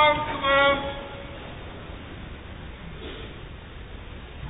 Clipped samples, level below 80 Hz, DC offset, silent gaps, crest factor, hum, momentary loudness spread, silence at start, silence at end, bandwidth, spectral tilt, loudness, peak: under 0.1%; -42 dBFS; under 0.1%; none; 20 dB; none; 22 LU; 0 s; 0 s; 4 kHz; -8.5 dB/octave; -23 LUFS; -8 dBFS